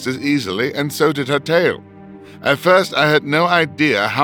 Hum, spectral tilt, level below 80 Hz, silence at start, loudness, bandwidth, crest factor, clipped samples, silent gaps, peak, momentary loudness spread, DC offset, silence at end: none; -5 dB/octave; -62 dBFS; 0 s; -16 LUFS; 19.5 kHz; 16 dB; under 0.1%; none; -2 dBFS; 7 LU; under 0.1%; 0 s